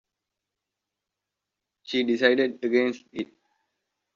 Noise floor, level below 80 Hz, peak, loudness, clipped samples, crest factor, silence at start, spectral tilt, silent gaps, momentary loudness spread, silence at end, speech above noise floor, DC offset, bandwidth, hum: -86 dBFS; -76 dBFS; -6 dBFS; -24 LUFS; under 0.1%; 22 dB; 1.85 s; -2 dB/octave; none; 15 LU; 0.9 s; 62 dB; under 0.1%; 7.2 kHz; none